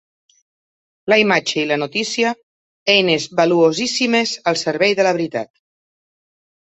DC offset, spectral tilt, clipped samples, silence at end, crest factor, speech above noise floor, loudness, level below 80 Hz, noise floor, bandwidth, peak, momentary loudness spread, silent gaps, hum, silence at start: under 0.1%; -3.5 dB/octave; under 0.1%; 1.25 s; 18 dB; over 73 dB; -17 LUFS; -64 dBFS; under -90 dBFS; 8.2 kHz; -2 dBFS; 10 LU; 2.43-2.86 s; none; 1.05 s